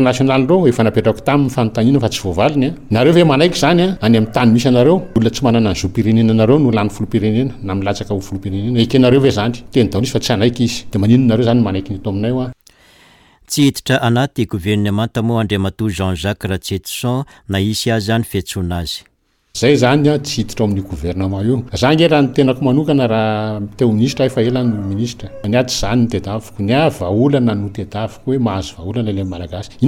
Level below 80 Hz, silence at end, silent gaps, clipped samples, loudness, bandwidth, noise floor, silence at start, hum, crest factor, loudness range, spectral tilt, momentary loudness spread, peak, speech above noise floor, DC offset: -38 dBFS; 0 s; none; under 0.1%; -15 LUFS; 17.5 kHz; -48 dBFS; 0 s; none; 12 dB; 5 LU; -6 dB/octave; 10 LU; -2 dBFS; 33 dB; under 0.1%